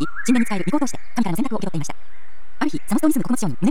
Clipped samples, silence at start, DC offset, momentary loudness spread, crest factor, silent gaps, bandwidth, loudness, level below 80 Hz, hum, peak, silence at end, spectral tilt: under 0.1%; 0 s; 10%; 8 LU; 16 dB; none; 17 kHz; -22 LUFS; -54 dBFS; none; -6 dBFS; 0 s; -5.5 dB/octave